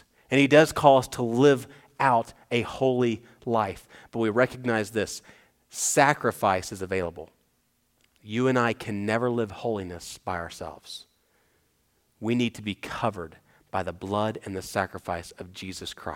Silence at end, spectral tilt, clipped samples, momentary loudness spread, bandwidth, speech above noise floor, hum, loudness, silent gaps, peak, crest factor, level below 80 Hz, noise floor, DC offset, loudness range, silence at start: 0 s; -4.5 dB/octave; under 0.1%; 17 LU; 18 kHz; 44 dB; none; -26 LUFS; none; -2 dBFS; 24 dB; -58 dBFS; -70 dBFS; under 0.1%; 9 LU; 0.3 s